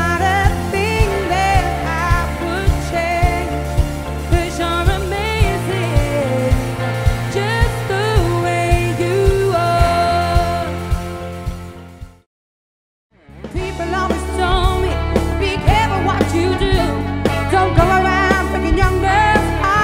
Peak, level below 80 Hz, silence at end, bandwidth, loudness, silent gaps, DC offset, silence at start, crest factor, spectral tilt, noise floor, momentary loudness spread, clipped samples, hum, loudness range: 0 dBFS; -22 dBFS; 0 s; 16 kHz; -17 LUFS; 12.26-13.10 s; under 0.1%; 0 s; 16 dB; -6 dB/octave; under -90 dBFS; 7 LU; under 0.1%; none; 7 LU